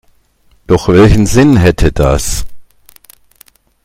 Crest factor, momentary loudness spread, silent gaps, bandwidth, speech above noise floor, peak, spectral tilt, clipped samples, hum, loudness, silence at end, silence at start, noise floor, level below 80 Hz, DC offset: 10 dB; 8 LU; none; 16.5 kHz; 42 dB; 0 dBFS; -6 dB/octave; 0.7%; none; -9 LUFS; 1.25 s; 0.7 s; -50 dBFS; -22 dBFS; under 0.1%